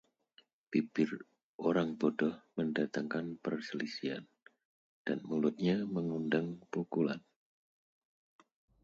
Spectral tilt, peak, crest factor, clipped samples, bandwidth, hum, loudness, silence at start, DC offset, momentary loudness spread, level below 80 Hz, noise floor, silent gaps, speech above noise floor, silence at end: -7 dB/octave; -18 dBFS; 20 dB; under 0.1%; 7.6 kHz; none; -36 LUFS; 0.7 s; under 0.1%; 8 LU; -76 dBFS; -69 dBFS; 1.43-1.59 s, 4.65-5.05 s; 34 dB; 1.65 s